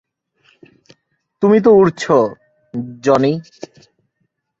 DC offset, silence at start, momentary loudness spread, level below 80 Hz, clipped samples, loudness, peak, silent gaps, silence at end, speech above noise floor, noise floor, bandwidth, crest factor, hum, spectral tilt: under 0.1%; 1.4 s; 23 LU; -56 dBFS; under 0.1%; -14 LUFS; -2 dBFS; none; 1.2 s; 56 dB; -70 dBFS; 7.8 kHz; 16 dB; none; -7 dB/octave